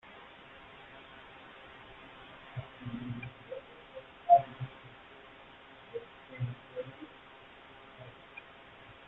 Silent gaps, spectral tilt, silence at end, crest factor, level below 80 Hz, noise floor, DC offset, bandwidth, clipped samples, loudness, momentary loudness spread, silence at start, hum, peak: none; -8.5 dB/octave; 0 s; 28 dB; -68 dBFS; -54 dBFS; under 0.1%; 4.1 kHz; under 0.1%; -35 LUFS; 13 LU; 0.05 s; none; -12 dBFS